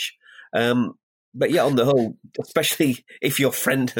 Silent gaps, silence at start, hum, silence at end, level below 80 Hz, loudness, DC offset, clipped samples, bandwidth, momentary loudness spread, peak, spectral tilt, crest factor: 1.03-1.32 s; 0 s; none; 0 s; -66 dBFS; -22 LUFS; under 0.1%; under 0.1%; 17 kHz; 9 LU; -4 dBFS; -4.5 dB/octave; 18 dB